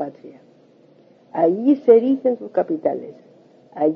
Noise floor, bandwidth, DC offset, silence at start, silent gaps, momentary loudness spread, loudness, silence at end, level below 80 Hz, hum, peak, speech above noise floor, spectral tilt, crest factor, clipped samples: -52 dBFS; 3.6 kHz; under 0.1%; 0 s; none; 17 LU; -18 LUFS; 0 s; -76 dBFS; none; -2 dBFS; 34 dB; -10 dB/octave; 18 dB; under 0.1%